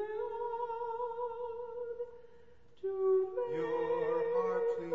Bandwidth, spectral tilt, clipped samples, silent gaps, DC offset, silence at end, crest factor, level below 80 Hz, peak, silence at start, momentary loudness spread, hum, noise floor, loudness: 6 kHz; -5.5 dB/octave; under 0.1%; none; 0.2%; 0 s; 12 dB; -72 dBFS; -22 dBFS; 0 s; 11 LU; 60 Hz at -75 dBFS; -62 dBFS; -36 LUFS